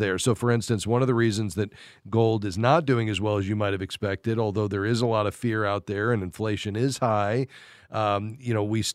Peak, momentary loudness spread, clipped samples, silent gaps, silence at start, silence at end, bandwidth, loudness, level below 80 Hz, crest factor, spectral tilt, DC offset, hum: -6 dBFS; 7 LU; under 0.1%; none; 0 s; 0 s; 14 kHz; -26 LUFS; -58 dBFS; 20 dB; -6 dB/octave; under 0.1%; none